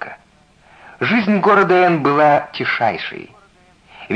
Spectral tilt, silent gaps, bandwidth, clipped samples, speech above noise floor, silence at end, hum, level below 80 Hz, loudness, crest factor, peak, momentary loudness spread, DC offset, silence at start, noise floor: -7 dB/octave; none; 9.4 kHz; under 0.1%; 37 dB; 0 s; none; -58 dBFS; -15 LUFS; 14 dB; -2 dBFS; 15 LU; under 0.1%; 0 s; -51 dBFS